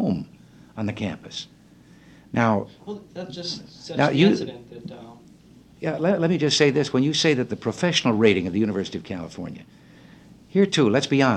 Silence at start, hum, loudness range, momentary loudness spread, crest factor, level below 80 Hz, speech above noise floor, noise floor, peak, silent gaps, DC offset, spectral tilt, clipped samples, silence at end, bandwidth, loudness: 0 s; none; 8 LU; 19 LU; 20 dB; -60 dBFS; 28 dB; -51 dBFS; -4 dBFS; none; under 0.1%; -5 dB/octave; under 0.1%; 0 s; 10.5 kHz; -22 LUFS